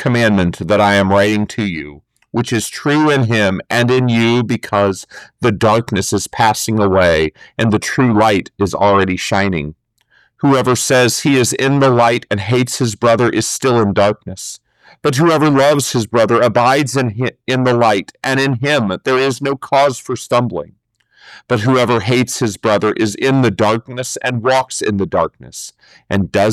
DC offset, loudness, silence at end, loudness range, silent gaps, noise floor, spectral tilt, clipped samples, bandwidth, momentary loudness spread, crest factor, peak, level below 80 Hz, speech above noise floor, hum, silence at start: under 0.1%; -14 LUFS; 0 s; 3 LU; none; -55 dBFS; -5 dB/octave; under 0.1%; 14.5 kHz; 9 LU; 12 dB; -4 dBFS; -46 dBFS; 41 dB; none; 0 s